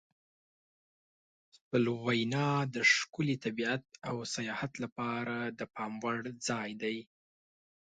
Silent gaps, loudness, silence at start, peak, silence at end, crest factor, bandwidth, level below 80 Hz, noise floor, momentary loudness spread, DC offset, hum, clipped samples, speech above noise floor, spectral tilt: 4.92-4.96 s; -34 LUFS; 1.7 s; -14 dBFS; 0.8 s; 22 dB; 9.4 kHz; -74 dBFS; under -90 dBFS; 12 LU; under 0.1%; none; under 0.1%; over 56 dB; -4.5 dB/octave